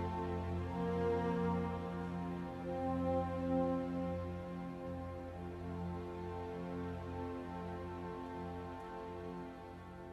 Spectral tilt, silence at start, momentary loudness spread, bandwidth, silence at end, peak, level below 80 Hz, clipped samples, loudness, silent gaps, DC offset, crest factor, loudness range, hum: -8.5 dB/octave; 0 s; 10 LU; 10 kHz; 0 s; -24 dBFS; -58 dBFS; under 0.1%; -41 LUFS; none; under 0.1%; 16 dB; 7 LU; 60 Hz at -60 dBFS